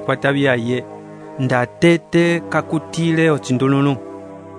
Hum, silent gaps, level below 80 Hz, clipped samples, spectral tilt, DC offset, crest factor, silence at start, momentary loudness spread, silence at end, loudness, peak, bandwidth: none; none; -56 dBFS; under 0.1%; -6.5 dB/octave; under 0.1%; 16 dB; 0 s; 18 LU; 0 s; -17 LUFS; -2 dBFS; 10.5 kHz